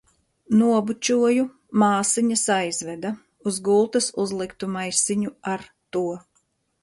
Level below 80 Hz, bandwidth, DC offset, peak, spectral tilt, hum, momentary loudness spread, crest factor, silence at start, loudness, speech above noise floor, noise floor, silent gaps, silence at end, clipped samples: -64 dBFS; 11.5 kHz; under 0.1%; -8 dBFS; -4 dB/octave; none; 11 LU; 16 dB; 0.5 s; -23 LUFS; 47 dB; -69 dBFS; none; 0.65 s; under 0.1%